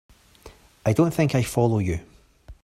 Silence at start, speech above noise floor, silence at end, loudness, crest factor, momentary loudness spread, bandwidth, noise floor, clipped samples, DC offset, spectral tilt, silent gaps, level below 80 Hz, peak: 0.45 s; 28 dB; 0.1 s; -23 LUFS; 18 dB; 8 LU; 15 kHz; -49 dBFS; under 0.1%; under 0.1%; -7 dB/octave; none; -48 dBFS; -6 dBFS